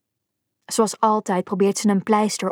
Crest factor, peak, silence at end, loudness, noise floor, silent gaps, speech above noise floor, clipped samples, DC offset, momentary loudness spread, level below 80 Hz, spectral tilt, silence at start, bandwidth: 18 dB; -4 dBFS; 0 s; -20 LUFS; -79 dBFS; none; 59 dB; under 0.1%; under 0.1%; 4 LU; -74 dBFS; -5 dB/octave; 0.7 s; 17 kHz